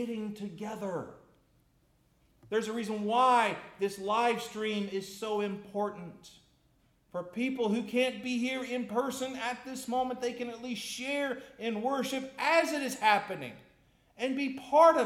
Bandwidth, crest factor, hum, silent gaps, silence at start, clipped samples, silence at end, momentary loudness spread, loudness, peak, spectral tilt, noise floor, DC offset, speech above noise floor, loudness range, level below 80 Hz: 16.5 kHz; 22 dB; none; none; 0 s; under 0.1%; 0 s; 13 LU; -32 LUFS; -10 dBFS; -4 dB/octave; -69 dBFS; under 0.1%; 38 dB; 4 LU; -72 dBFS